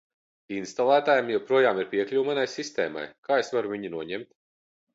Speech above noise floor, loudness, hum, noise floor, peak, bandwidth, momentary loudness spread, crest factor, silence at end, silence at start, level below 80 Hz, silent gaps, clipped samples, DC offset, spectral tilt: over 64 dB; -26 LUFS; none; under -90 dBFS; -8 dBFS; 8 kHz; 13 LU; 18 dB; 0.7 s; 0.5 s; -74 dBFS; 3.18-3.23 s; under 0.1%; under 0.1%; -4.5 dB/octave